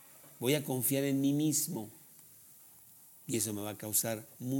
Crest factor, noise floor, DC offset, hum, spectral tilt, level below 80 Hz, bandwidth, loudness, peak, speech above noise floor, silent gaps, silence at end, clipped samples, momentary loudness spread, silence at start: 20 dB; -58 dBFS; under 0.1%; none; -4 dB/octave; -80 dBFS; over 20 kHz; -33 LUFS; -16 dBFS; 25 dB; none; 0 s; under 0.1%; 24 LU; 0.05 s